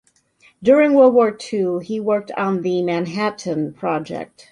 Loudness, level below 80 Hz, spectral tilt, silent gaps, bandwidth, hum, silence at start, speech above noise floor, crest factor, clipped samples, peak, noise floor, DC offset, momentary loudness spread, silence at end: -18 LUFS; -62 dBFS; -6.5 dB/octave; none; 11 kHz; none; 0.6 s; 38 dB; 16 dB; under 0.1%; -2 dBFS; -56 dBFS; under 0.1%; 12 LU; 0.25 s